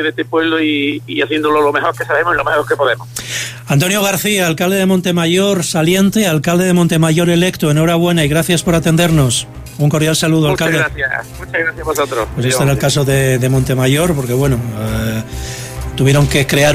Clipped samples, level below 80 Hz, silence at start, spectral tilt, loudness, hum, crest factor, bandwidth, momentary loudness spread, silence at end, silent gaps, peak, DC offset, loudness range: under 0.1%; -34 dBFS; 0 s; -5 dB/octave; -13 LUFS; none; 12 dB; 16 kHz; 7 LU; 0 s; none; -2 dBFS; under 0.1%; 3 LU